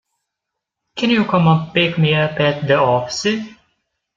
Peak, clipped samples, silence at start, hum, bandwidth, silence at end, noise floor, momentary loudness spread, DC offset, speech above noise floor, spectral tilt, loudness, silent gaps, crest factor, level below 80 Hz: -2 dBFS; under 0.1%; 0.95 s; none; 7.6 kHz; 0.65 s; -80 dBFS; 8 LU; under 0.1%; 65 dB; -6 dB/octave; -16 LUFS; none; 16 dB; -54 dBFS